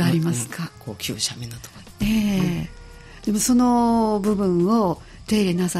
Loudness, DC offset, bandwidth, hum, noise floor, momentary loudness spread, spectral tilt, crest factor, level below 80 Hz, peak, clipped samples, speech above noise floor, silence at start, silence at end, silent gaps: -21 LUFS; under 0.1%; 16 kHz; none; -41 dBFS; 15 LU; -5.5 dB/octave; 12 dB; -44 dBFS; -10 dBFS; under 0.1%; 20 dB; 0 s; 0 s; none